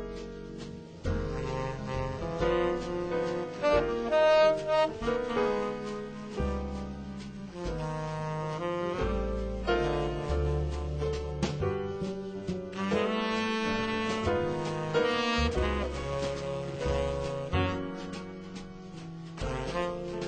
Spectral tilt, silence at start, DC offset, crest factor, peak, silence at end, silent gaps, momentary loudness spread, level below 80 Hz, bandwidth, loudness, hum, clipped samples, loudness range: -6 dB/octave; 0 s; under 0.1%; 18 dB; -12 dBFS; 0 s; none; 13 LU; -40 dBFS; 9.2 kHz; -31 LUFS; none; under 0.1%; 7 LU